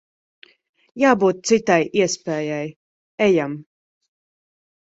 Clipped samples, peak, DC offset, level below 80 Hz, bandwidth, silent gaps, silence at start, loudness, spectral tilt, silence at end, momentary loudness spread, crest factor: under 0.1%; 0 dBFS; under 0.1%; -62 dBFS; 8 kHz; 2.76-3.18 s; 0.95 s; -19 LUFS; -4.5 dB/octave; 1.2 s; 12 LU; 20 dB